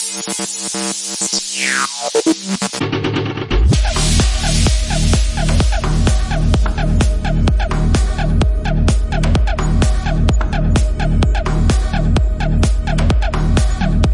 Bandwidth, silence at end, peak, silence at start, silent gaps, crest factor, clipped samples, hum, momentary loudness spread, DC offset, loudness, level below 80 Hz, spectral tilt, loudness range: 11.5 kHz; 0 s; -2 dBFS; 0 s; none; 12 dB; under 0.1%; none; 4 LU; under 0.1%; -16 LUFS; -16 dBFS; -4.5 dB/octave; 1 LU